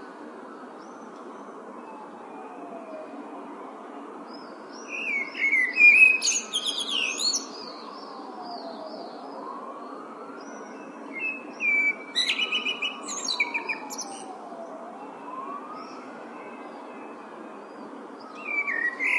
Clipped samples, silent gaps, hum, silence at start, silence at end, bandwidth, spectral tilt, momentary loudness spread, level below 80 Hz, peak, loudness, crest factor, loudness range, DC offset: under 0.1%; none; none; 0 s; 0 s; 12 kHz; 0.5 dB/octave; 20 LU; under -90 dBFS; -6 dBFS; -22 LUFS; 24 dB; 21 LU; under 0.1%